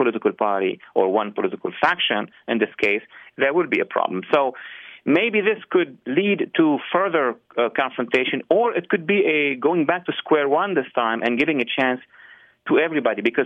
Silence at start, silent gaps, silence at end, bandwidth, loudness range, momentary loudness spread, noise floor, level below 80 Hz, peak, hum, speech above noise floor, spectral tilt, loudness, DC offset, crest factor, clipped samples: 0 s; none; 0 s; 7.8 kHz; 2 LU; 6 LU; -49 dBFS; -70 dBFS; -4 dBFS; none; 28 dB; -7 dB/octave; -21 LUFS; under 0.1%; 18 dB; under 0.1%